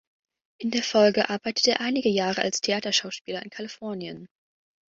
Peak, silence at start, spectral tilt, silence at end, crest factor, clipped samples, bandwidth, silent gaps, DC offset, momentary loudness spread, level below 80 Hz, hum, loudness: -6 dBFS; 0.6 s; -3 dB/octave; 0.65 s; 20 dB; under 0.1%; 7.8 kHz; 3.21-3.25 s; under 0.1%; 15 LU; -70 dBFS; none; -25 LUFS